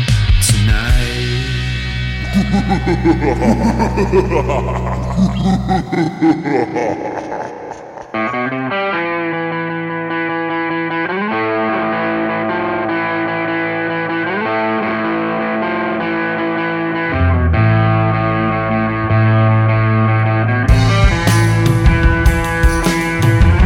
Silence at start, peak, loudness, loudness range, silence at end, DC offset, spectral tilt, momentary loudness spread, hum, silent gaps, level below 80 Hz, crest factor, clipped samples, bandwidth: 0 s; 0 dBFS; -15 LUFS; 5 LU; 0 s; under 0.1%; -6 dB/octave; 7 LU; none; none; -22 dBFS; 14 dB; under 0.1%; 16.5 kHz